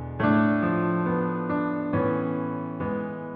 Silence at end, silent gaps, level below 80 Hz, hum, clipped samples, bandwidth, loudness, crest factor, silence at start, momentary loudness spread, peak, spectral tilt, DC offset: 0 s; none; -54 dBFS; none; under 0.1%; 4.7 kHz; -26 LUFS; 16 dB; 0 s; 8 LU; -10 dBFS; -11.5 dB/octave; under 0.1%